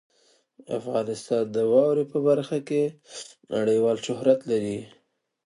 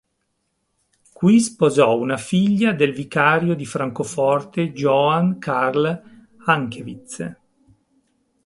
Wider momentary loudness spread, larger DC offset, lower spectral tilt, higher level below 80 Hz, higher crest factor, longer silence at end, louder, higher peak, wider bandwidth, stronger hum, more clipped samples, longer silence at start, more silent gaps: about the same, 13 LU vs 15 LU; neither; about the same, -6 dB/octave vs -6 dB/octave; second, -70 dBFS vs -60 dBFS; about the same, 18 dB vs 20 dB; second, 0.6 s vs 1.1 s; second, -25 LUFS vs -19 LUFS; second, -6 dBFS vs 0 dBFS; about the same, 11 kHz vs 11.5 kHz; neither; neither; second, 0.7 s vs 1.2 s; neither